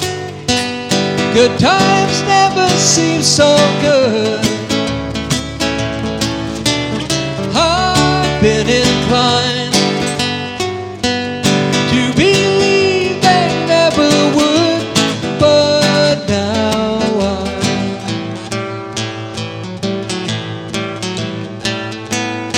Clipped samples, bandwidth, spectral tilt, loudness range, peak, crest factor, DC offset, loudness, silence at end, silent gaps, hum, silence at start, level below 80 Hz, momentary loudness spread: under 0.1%; 16.5 kHz; -4 dB/octave; 9 LU; 0 dBFS; 14 dB; under 0.1%; -14 LUFS; 0 s; none; none; 0 s; -38 dBFS; 11 LU